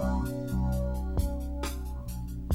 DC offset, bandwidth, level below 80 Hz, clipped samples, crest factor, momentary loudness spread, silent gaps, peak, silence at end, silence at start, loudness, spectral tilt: under 0.1%; 16 kHz; -34 dBFS; under 0.1%; 14 dB; 8 LU; none; -16 dBFS; 0 s; 0 s; -33 LUFS; -7 dB/octave